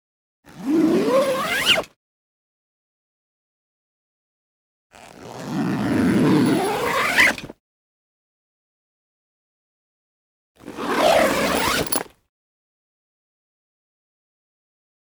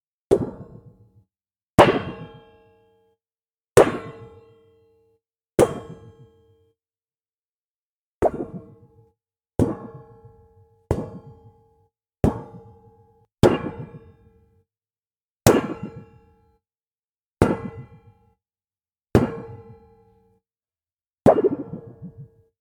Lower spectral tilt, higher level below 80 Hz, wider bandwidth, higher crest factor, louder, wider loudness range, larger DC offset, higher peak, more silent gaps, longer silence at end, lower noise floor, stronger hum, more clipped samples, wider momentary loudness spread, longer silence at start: second, -4 dB/octave vs -6 dB/octave; second, -52 dBFS vs -44 dBFS; about the same, over 20 kHz vs 19 kHz; about the same, 22 dB vs 24 dB; first, -19 LUFS vs -22 LUFS; about the same, 9 LU vs 8 LU; neither; about the same, -4 dBFS vs -2 dBFS; first, 1.96-4.90 s, 7.60-10.55 s vs 1.70-1.78 s, 7.45-8.21 s, 15.23-15.36 s, 17.11-17.15 s, 17.26-17.35 s; first, 3 s vs 0.35 s; about the same, under -90 dBFS vs under -90 dBFS; neither; neither; second, 16 LU vs 25 LU; first, 0.55 s vs 0.3 s